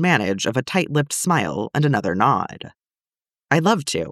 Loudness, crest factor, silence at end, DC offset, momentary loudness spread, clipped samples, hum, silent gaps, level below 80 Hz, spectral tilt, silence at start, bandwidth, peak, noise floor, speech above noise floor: -20 LUFS; 18 dB; 0 s; under 0.1%; 5 LU; under 0.1%; none; none; -58 dBFS; -5 dB/octave; 0 s; 14 kHz; -2 dBFS; under -90 dBFS; over 70 dB